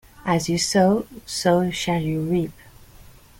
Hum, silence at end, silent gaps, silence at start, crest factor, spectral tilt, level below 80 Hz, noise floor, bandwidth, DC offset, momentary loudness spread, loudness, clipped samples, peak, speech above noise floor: none; 0.35 s; none; 0.25 s; 18 dB; -5 dB/octave; -50 dBFS; -47 dBFS; 17 kHz; under 0.1%; 7 LU; -22 LUFS; under 0.1%; -6 dBFS; 26 dB